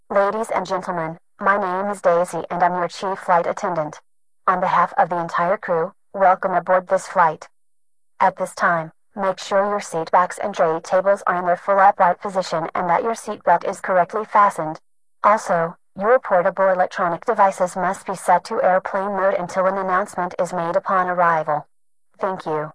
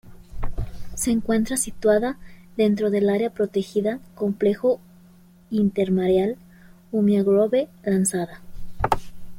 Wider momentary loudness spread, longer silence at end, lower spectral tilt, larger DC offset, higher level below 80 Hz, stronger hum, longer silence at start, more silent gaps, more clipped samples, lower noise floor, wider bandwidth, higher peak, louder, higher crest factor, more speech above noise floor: second, 8 LU vs 14 LU; about the same, 0.05 s vs 0 s; about the same, -5 dB/octave vs -5.5 dB/octave; neither; second, -62 dBFS vs -40 dBFS; neither; about the same, 0.1 s vs 0.05 s; neither; neither; first, -80 dBFS vs -51 dBFS; second, 11 kHz vs 16.5 kHz; about the same, -2 dBFS vs -2 dBFS; first, -20 LUFS vs -23 LUFS; about the same, 16 dB vs 20 dB; first, 61 dB vs 29 dB